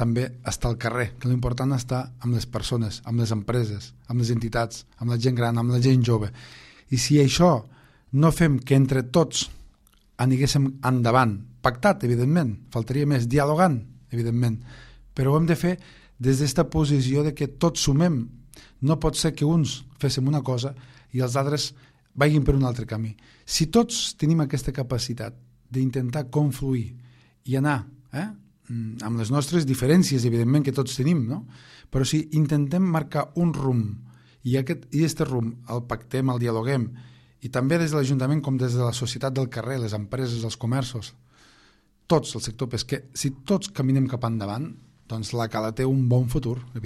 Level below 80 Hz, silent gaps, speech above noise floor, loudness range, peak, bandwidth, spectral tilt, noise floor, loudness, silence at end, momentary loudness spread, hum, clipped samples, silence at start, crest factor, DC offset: -44 dBFS; none; 36 dB; 5 LU; -4 dBFS; 14 kHz; -6 dB/octave; -59 dBFS; -24 LUFS; 0 s; 11 LU; none; under 0.1%; 0 s; 20 dB; under 0.1%